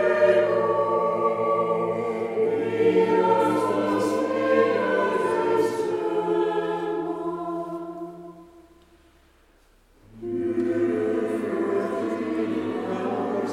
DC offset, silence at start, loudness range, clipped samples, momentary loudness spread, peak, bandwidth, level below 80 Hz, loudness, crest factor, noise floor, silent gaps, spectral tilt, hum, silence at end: under 0.1%; 0 s; 11 LU; under 0.1%; 10 LU; -8 dBFS; 13 kHz; -62 dBFS; -24 LUFS; 16 dB; -58 dBFS; none; -6.5 dB/octave; none; 0 s